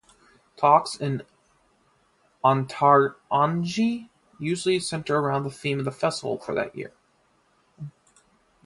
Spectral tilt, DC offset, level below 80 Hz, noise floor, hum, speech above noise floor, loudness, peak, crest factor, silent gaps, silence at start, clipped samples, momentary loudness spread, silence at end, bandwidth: -5.5 dB/octave; under 0.1%; -66 dBFS; -65 dBFS; none; 42 dB; -24 LUFS; -4 dBFS; 22 dB; none; 0.6 s; under 0.1%; 16 LU; 0.75 s; 11.5 kHz